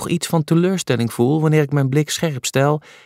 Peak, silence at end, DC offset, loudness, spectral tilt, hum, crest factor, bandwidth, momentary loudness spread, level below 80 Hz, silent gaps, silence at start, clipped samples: -2 dBFS; 0.25 s; under 0.1%; -18 LUFS; -5.5 dB/octave; none; 14 dB; 16 kHz; 4 LU; -58 dBFS; none; 0 s; under 0.1%